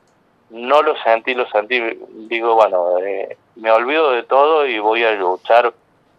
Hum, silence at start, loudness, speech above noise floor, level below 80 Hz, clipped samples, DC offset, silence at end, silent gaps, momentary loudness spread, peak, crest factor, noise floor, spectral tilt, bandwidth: none; 0.5 s; -16 LUFS; 41 dB; -74 dBFS; under 0.1%; under 0.1%; 0.5 s; none; 10 LU; 0 dBFS; 16 dB; -57 dBFS; -4 dB/octave; 7.6 kHz